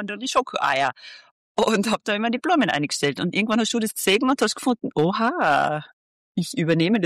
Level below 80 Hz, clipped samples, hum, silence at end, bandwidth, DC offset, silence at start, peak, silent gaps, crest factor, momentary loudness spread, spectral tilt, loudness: -62 dBFS; under 0.1%; none; 0 s; 14.5 kHz; under 0.1%; 0 s; -8 dBFS; 1.31-1.55 s, 5.93-6.35 s; 14 dB; 7 LU; -4.5 dB/octave; -22 LUFS